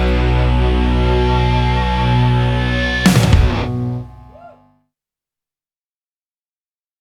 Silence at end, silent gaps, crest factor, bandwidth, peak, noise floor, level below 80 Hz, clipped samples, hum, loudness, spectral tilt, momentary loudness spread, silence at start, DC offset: 2.55 s; none; 16 dB; 14.5 kHz; 0 dBFS; under -90 dBFS; -20 dBFS; under 0.1%; none; -15 LUFS; -6 dB/octave; 8 LU; 0 s; under 0.1%